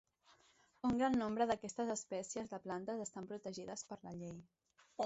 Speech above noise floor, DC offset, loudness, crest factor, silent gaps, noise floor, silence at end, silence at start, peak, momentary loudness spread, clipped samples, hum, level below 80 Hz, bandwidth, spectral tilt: 31 dB; under 0.1%; -42 LUFS; 18 dB; none; -72 dBFS; 0 s; 0.85 s; -24 dBFS; 14 LU; under 0.1%; none; -72 dBFS; 8 kHz; -5 dB/octave